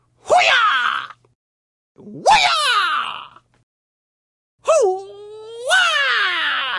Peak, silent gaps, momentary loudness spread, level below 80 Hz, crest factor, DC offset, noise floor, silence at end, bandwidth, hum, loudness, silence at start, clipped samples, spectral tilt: -2 dBFS; 1.35-1.95 s, 3.63-4.58 s; 19 LU; -56 dBFS; 16 dB; under 0.1%; -38 dBFS; 0 s; 11.5 kHz; none; -16 LUFS; 0.25 s; under 0.1%; -0.5 dB/octave